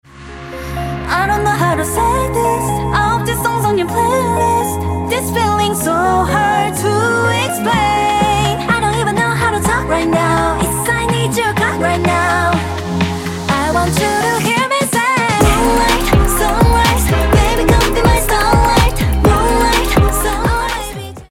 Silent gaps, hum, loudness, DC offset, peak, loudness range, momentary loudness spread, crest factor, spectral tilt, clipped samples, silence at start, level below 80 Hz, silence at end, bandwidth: none; none; -14 LUFS; under 0.1%; -2 dBFS; 3 LU; 6 LU; 12 dB; -4.5 dB/octave; under 0.1%; 0.15 s; -22 dBFS; 0.05 s; 17 kHz